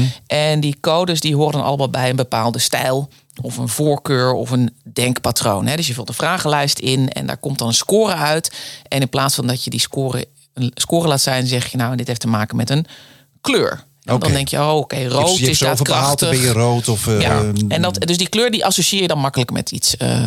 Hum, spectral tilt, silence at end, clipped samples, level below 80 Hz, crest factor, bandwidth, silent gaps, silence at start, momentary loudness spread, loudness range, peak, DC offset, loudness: none; -4 dB/octave; 0 s; under 0.1%; -46 dBFS; 14 dB; 17 kHz; none; 0 s; 7 LU; 3 LU; -4 dBFS; under 0.1%; -17 LUFS